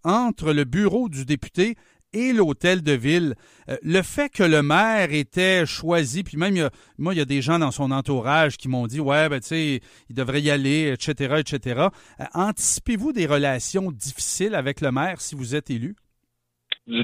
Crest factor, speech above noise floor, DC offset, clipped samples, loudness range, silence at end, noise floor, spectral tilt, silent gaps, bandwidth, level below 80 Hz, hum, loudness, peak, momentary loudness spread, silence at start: 18 dB; 53 dB; under 0.1%; under 0.1%; 3 LU; 0 s; -76 dBFS; -4.5 dB/octave; none; 15.5 kHz; -50 dBFS; none; -22 LUFS; -4 dBFS; 10 LU; 0.05 s